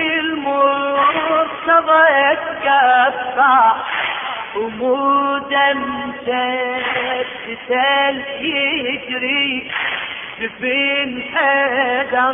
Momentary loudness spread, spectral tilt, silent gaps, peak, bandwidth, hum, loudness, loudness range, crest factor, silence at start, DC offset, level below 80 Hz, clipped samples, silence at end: 11 LU; -6.5 dB/octave; none; -2 dBFS; 3.8 kHz; none; -16 LUFS; 5 LU; 16 dB; 0 s; under 0.1%; -56 dBFS; under 0.1%; 0 s